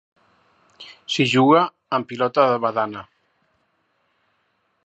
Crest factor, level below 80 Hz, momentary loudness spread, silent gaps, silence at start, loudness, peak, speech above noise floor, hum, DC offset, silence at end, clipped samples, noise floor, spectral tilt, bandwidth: 20 dB; -70 dBFS; 22 LU; none; 0.8 s; -19 LUFS; -2 dBFS; 49 dB; none; under 0.1%; 1.85 s; under 0.1%; -68 dBFS; -5.5 dB/octave; 8.6 kHz